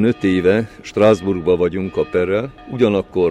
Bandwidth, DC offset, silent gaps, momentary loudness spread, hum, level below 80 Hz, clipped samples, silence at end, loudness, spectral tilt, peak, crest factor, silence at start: 10 kHz; under 0.1%; none; 7 LU; none; -46 dBFS; under 0.1%; 0 s; -17 LUFS; -7 dB/octave; -2 dBFS; 14 dB; 0 s